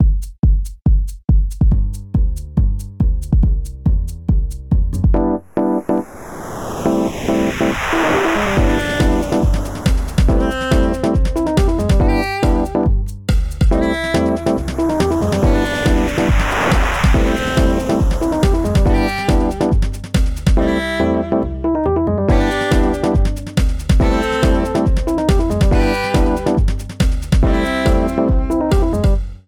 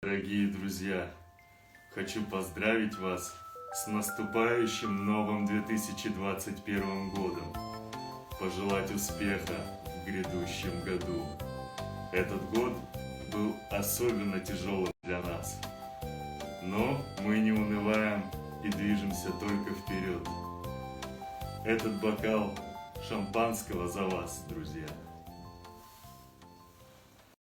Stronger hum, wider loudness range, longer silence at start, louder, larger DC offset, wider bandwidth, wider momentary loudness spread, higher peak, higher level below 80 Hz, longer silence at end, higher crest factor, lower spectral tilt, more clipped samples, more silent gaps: neither; about the same, 3 LU vs 4 LU; about the same, 0 s vs 0 s; first, -17 LUFS vs -34 LUFS; neither; second, 15.5 kHz vs 19.5 kHz; second, 4 LU vs 12 LU; first, -2 dBFS vs -16 dBFS; first, -18 dBFS vs -54 dBFS; second, 0.1 s vs 0.25 s; second, 12 dB vs 20 dB; first, -6.5 dB/octave vs -5 dB/octave; neither; neither